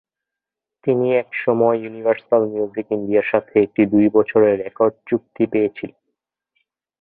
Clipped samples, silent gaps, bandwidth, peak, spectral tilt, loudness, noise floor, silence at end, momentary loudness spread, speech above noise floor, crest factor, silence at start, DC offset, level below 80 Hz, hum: under 0.1%; none; 3.9 kHz; -2 dBFS; -12 dB/octave; -19 LUFS; -86 dBFS; 1.15 s; 9 LU; 68 dB; 16 dB; 0.85 s; under 0.1%; -60 dBFS; none